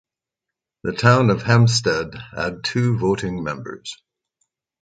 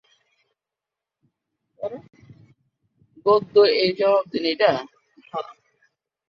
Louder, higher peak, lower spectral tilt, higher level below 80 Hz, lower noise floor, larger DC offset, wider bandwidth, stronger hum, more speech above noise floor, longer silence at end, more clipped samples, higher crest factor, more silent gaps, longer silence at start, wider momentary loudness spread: about the same, -19 LUFS vs -20 LUFS; first, 0 dBFS vs -4 dBFS; about the same, -5.5 dB/octave vs -6 dB/octave; first, -48 dBFS vs -70 dBFS; about the same, -85 dBFS vs -87 dBFS; neither; first, 9.2 kHz vs 6.2 kHz; neither; about the same, 66 dB vs 69 dB; about the same, 0.9 s vs 0.8 s; neither; about the same, 20 dB vs 20 dB; neither; second, 0.85 s vs 1.8 s; about the same, 16 LU vs 18 LU